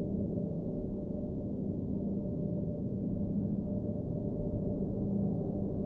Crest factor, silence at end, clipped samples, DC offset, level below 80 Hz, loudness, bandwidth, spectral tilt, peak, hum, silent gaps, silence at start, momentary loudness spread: 12 dB; 0 s; under 0.1%; under 0.1%; -50 dBFS; -36 LUFS; 1.6 kHz; -13.5 dB/octave; -22 dBFS; none; none; 0 s; 4 LU